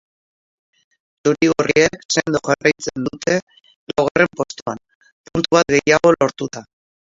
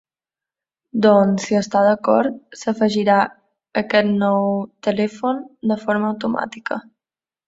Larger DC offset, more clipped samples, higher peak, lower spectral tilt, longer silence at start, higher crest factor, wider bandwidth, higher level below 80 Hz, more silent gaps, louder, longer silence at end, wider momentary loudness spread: neither; neither; about the same, 0 dBFS vs -2 dBFS; second, -4 dB/octave vs -6 dB/octave; first, 1.25 s vs 0.95 s; about the same, 20 dB vs 18 dB; about the same, 7.8 kHz vs 7.8 kHz; first, -52 dBFS vs -62 dBFS; first, 2.05-2.09 s, 3.42-3.47 s, 3.76-3.87 s, 4.11-4.15 s, 4.62-4.66 s, 4.95-5.01 s, 5.12-5.24 s vs none; about the same, -18 LUFS vs -19 LUFS; about the same, 0.6 s vs 0.65 s; first, 14 LU vs 10 LU